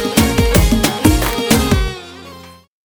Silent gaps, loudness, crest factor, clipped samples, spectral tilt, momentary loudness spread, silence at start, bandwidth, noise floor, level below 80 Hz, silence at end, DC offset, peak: none; -14 LUFS; 14 dB; under 0.1%; -4.5 dB/octave; 20 LU; 0 s; over 20 kHz; -37 dBFS; -20 dBFS; 0.35 s; under 0.1%; 0 dBFS